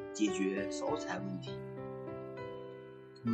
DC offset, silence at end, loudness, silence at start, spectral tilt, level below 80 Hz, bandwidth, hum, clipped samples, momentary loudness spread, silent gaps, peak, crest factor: under 0.1%; 0 s; -39 LUFS; 0 s; -5.5 dB/octave; -68 dBFS; 9.2 kHz; none; under 0.1%; 13 LU; none; -20 dBFS; 18 dB